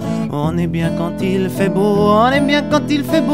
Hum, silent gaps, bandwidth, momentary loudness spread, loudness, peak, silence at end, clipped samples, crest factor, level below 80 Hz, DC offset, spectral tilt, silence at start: none; none; 16 kHz; 7 LU; -16 LUFS; 0 dBFS; 0 s; under 0.1%; 14 dB; -40 dBFS; 0.9%; -6.5 dB/octave; 0 s